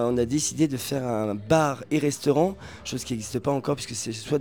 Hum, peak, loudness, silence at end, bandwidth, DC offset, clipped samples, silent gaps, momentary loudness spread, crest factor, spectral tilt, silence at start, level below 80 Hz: none; -6 dBFS; -26 LUFS; 0 s; over 20 kHz; 0.2%; under 0.1%; none; 8 LU; 18 dB; -5 dB/octave; 0 s; -52 dBFS